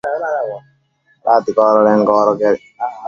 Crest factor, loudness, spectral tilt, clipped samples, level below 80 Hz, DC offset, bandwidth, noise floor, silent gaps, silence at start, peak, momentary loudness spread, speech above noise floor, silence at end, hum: 14 dB; -14 LUFS; -7 dB/octave; under 0.1%; -60 dBFS; under 0.1%; 7 kHz; -58 dBFS; none; 0.05 s; 0 dBFS; 13 LU; 45 dB; 0 s; none